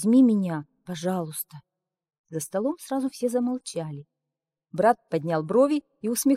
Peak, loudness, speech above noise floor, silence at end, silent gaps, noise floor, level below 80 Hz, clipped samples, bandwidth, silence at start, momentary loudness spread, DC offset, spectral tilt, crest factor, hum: -8 dBFS; -26 LUFS; 63 dB; 0 s; 2.19-2.24 s; -87 dBFS; -72 dBFS; under 0.1%; 16 kHz; 0 s; 16 LU; under 0.1%; -6 dB/octave; 16 dB; none